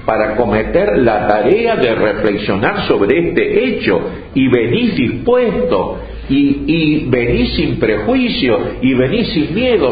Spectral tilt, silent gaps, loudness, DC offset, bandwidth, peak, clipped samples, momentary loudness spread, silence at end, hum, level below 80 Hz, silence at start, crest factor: -9.5 dB/octave; none; -14 LUFS; under 0.1%; 5 kHz; 0 dBFS; under 0.1%; 3 LU; 0 s; none; -32 dBFS; 0 s; 14 dB